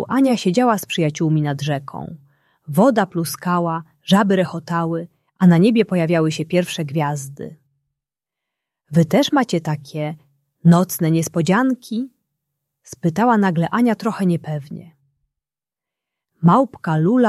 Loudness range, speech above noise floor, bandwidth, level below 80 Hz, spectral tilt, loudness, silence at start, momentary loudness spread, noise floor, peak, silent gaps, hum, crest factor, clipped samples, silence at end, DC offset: 4 LU; 72 dB; 13.5 kHz; -60 dBFS; -6.5 dB/octave; -18 LUFS; 0 s; 13 LU; -90 dBFS; -2 dBFS; none; none; 16 dB; under 0.1%; 0 s; under 0.1%